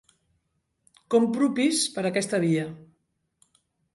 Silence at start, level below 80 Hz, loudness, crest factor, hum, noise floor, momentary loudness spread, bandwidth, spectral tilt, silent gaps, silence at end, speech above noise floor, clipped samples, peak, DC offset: 1.1 s; -72 dBFS; -24 LUFS; 18 dB; none; -75 dBFS; 5 LU; 11.5 kHz; -4.5 dB/octave; none; 1.1 s; 51 dB; under 0.1%; -10 dBFS; under 0.1%